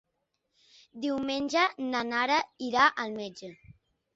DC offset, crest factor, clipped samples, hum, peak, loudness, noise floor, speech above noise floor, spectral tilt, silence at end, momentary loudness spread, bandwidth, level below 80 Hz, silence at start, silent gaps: under 0.1%; 22 dB; under 0.1%; none; -8 dBFS; -28 LUFS; -80 dBFS; 51 dB; -3 dB/octave; 0.45 s; 15 LU; 8 kHz; -68 dBFS; 0.95 s; none